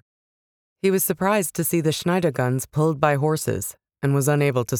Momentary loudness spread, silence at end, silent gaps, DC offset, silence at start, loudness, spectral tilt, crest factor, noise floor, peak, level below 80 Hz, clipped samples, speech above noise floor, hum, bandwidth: 6 LU; 0 s; none; under 0.1%; 0.85 s; -22 LUFS; -5.5 dB/octave; 18 dB; under -90 dBFS; -4 dBFS; -56 dBFS; under 0.1%; over 69 dB; none; 20 kHz